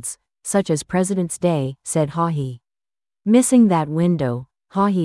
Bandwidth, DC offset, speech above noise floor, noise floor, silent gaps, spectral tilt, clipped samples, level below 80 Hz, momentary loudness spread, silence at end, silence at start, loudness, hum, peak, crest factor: 12 kHz; under 0.1%; over 72 dB; under -90 dBFS; none; -6 dB/octave; under 0.1%; -56 dBFS; 14 LU; 0 s; 0.05 s; -19 LUFS; none; -4 dBFS; 16 dB